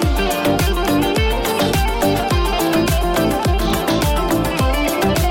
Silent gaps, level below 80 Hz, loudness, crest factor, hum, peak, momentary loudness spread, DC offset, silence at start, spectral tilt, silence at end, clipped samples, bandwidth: none; -22 dBFS; -17 LUFS; 10 dB; none; -6 dBFS; 1 LU; under 0.1%; 0 s; -5 dB/octave; 0 s; under 0.1%; 17 kHz